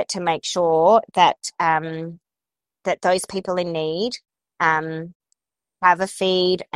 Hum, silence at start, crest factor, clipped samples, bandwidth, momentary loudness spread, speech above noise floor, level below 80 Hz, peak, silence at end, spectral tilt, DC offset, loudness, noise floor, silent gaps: none; 0 s; 20 dB; under 0.1%; 13.5 kHz; 14 LU; 70 dB; -62 dBFS; -2 dBFS; 0.15 s; -4 dB/octave; under 0.1%; -20 LUFS; -90 dBFS; 5.15-5.20 s